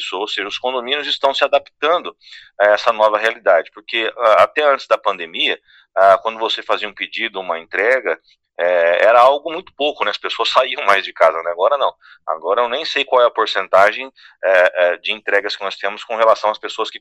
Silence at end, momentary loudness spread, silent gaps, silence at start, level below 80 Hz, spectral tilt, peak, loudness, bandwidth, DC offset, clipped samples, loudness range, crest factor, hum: 0.05 s; 10 LU; none; 0 s; -66 dBFS; -2 dB/octave; 0 dBFS; -16 LUFS; 10.5 kHz; under 0.1%; under 0.1%; 2 LU; 16 dB; none